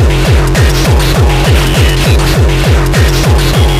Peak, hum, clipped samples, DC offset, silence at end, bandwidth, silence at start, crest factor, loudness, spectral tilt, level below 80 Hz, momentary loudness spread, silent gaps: 0 dBFS; none; under 0.1%; under 0.1%; 0 s; 15.5 kHz; 0 s; 8 dB; -9 LUFS; -5 dB/octave; -10 dBFS; 1 LU; none